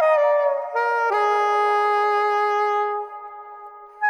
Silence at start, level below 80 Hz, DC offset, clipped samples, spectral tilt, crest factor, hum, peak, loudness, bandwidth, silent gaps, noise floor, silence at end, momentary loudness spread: 0 s; -78 dBFS; under 0.1%; under 0.1%; -0.5 dB/octave; 14 dB; none; -8 dBFS; -20 LUFS; 10.5 kHz; none; -41 dBFS; 0 s; 18 LU